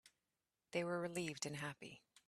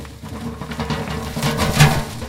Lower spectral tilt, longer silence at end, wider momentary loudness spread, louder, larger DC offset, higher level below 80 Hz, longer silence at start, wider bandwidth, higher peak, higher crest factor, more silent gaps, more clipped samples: about the same, -4 dB/octave vs -5 dB/octave; first, 0.3 s vs 0 s; second, 11 LU vs 16 LU; second, -45 LUFS vs -19 LUFS; neither; second, -82 dBFS vs -34 dBFS; about the same, 0.05 s vs 0 s; second, 14.5 kHz vs 16.5 kHz; second, -26 dBFS vs 0 dBFS; about the same, 22 dB vs 20 dB; neither; neither